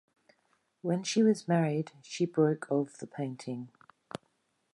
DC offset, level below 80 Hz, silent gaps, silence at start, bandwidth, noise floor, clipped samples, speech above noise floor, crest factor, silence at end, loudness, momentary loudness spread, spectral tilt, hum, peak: under 0.1%; -80 dBFS; none; 0.85 s; 11.5 kHz; -75 dBFS; under 0.1%; 45 dB; 18 dB; 1.05 s; -31 LUFS; 19 LU; -6 dB/octave; none; -14 dBFS